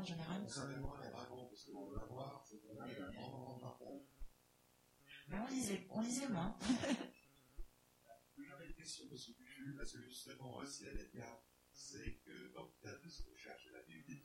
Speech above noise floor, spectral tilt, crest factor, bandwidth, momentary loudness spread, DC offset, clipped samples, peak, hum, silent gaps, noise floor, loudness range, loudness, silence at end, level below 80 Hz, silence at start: 26 dB; -4.5 dB/octave; 24 dB; 16.5 kHz; 20 LU; under 0.1%; under 0.1%; -26 dBFS; none; none; -74 dBFS; 11 LU; -49 LUFS; 0 s; -62 dBFS; 0 s